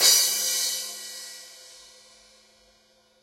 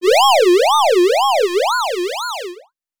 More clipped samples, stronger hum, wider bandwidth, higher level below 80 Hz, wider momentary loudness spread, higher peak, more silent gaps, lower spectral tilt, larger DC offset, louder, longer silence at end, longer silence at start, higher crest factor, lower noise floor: neither; neither; second, 16 kHz vs over 20 kHz; second, -76 dBFS vs -66 dBFS; first, 26 LU vs 13 LU; about the same, -4 dBFS vs -2 dBFS; neither; second, 3.5 dB/octave vs 0 dB/octave; neither; second, -23 LUFS vs -14 LUFS; first, 1.5 s vs 0.4 s; about the same, 0 s vs 0 s; first, 24 dB vs 12 dB; first, -62 dBFS vs -40 dBFS